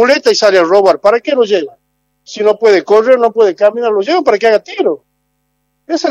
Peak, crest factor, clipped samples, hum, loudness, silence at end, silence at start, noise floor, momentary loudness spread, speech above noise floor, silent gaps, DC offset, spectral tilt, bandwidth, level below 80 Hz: 0 dBFS; 10 dB; 0.3%; 50 Hz at -55 dBFS; -11 LUFS; 0 s; 0 s; -64 dBFS; 8 LU; 54 dB; none; under 0.1%; -3.5 dB/octave; 11 kHz; -58 dBFS